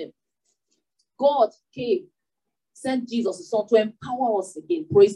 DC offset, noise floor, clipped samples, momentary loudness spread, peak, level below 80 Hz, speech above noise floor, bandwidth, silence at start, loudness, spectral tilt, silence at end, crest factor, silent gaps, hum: under 0.1%; -85 dBFS; under 0.1%; 9 LU; -4 dBFS; -74 dBFS; 63 dB; 11 kHz; 0 s; -24 LUFS; -6 dB/octave; 0 s; 20 dB; none; none